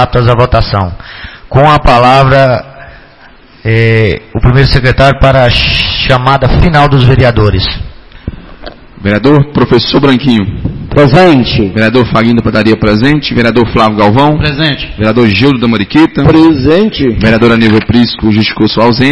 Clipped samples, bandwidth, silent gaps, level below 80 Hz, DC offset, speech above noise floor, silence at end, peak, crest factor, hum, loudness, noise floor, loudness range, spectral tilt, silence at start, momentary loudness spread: 3%; 11 kHz; none; -20 dBFS; 1%; 30 dB; 0 s; 0 dBFS; 8 dB; none; -7 LUFS; -36 dBFS; 2 LU; -7.5 dB/octave; 0 s; 8 LU